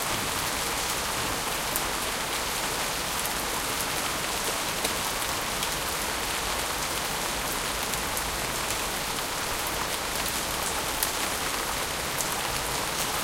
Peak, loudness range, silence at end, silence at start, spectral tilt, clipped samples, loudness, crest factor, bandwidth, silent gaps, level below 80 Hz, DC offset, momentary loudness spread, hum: -4 dBFS; 1 LU; 0 s; 0 s; -1.5 dB/octave; under 0.1%; -27 LUFS; 26 dB; 17 kHz; none; -44 dBFS; under 0.1%; 1 LU; none